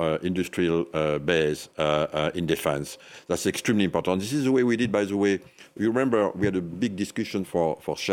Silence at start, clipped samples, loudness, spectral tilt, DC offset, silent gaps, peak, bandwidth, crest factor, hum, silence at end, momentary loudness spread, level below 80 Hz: 0 s; under 0.1%; -25 LUFS; -5.5 dB/octave; under 0.1%; none; -6 dBFS; 17.5 kHz; 18 dB; none; 0 s; 7 LU; -56 dBFS